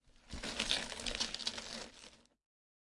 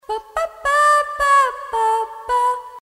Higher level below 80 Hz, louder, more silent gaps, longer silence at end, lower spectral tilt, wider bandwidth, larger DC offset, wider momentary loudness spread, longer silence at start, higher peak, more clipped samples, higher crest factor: second, -56 dBFS vs -48 dBFS; second, -39 LUFS vs -18 LUFS; neither; first, 0.75 s vs 0.05 s; about the same, -1 dB/octave vs 0 dB/octave; second, 12 kHz vs 16 kHz; neither; first, 17 LU vs 9 LU; about the same, 0.05 s vs 0.1 s; second, -18 dBFS vs -6 dBFS; neither; first, 26 dB vs 14 dB